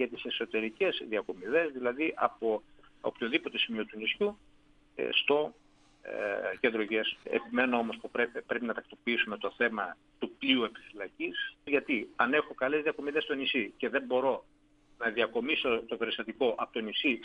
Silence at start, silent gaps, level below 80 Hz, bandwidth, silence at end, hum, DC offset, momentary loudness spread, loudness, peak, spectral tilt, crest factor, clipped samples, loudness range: 0 s; none; -68 dBFS; 9 kHz; 0 s; none; under 0.1%; 8 LU; -32 LUFS; -10 dBFS; -5.5 dB/octave; 22 dB; under 0.1%; 1 LU